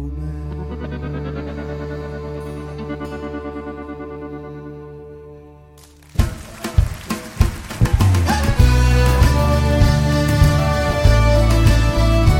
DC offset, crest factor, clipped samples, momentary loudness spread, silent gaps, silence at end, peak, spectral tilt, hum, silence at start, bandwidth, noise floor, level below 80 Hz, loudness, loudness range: under 0.1%; 16 dB; under 0.1%; 16 LU; none; 0 s; 0 dBFS; -6 dB/octave; none; 0 s; 17 kHz; -44 dBFS; -20 dBFS; -18 LUFS; 15 LU